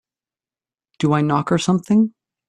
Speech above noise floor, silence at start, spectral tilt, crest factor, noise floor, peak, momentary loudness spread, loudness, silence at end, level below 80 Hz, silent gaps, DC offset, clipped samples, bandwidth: over 73 dB; 1 s; -6.5 dB/octave; 16 dB; under -90 dBFS; -4 dBFS; 5 LU; -19 LUFS; 0.4 s; -58 dBFS; none; under 0.1%; under 0.1%; 11 kHz